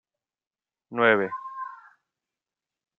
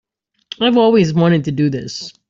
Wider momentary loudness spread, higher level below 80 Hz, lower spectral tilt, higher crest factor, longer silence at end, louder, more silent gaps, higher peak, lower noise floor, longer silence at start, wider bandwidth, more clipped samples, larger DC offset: first, 17 LU vs 14 LU; second, -80 dBFS vs -52 dBFS; about the same, -7.5 dB/octave vs -6.5 dB/octave; first, 26 dB vs 14 dB; first, 1.25 s vs 0.2 s; second, -24 LUFS vs -14 LUFS; neither; about the same, -4 dBFS vs -2 dBFS; first, under -90 dBFS vs -38 dBFS; first, 0.9 s vs 0.6 s; second, 4.3 kHz vs 7.6 kHz; neither; neither